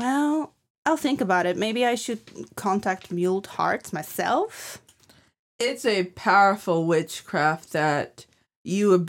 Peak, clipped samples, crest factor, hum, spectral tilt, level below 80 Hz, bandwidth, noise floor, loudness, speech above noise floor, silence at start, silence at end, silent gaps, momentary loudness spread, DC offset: -6 dBFS; under 0.1%; 18 dB; none; -5 dB/octave; -68 dBFS; 17 kHz; -58 dBFS; -24 LUFS; 34 dB; 0 s; 0 s; 0.70-0.83 s, 5.39-5.59 s, 8.56-8.65 s; 12 LU; under 0.1%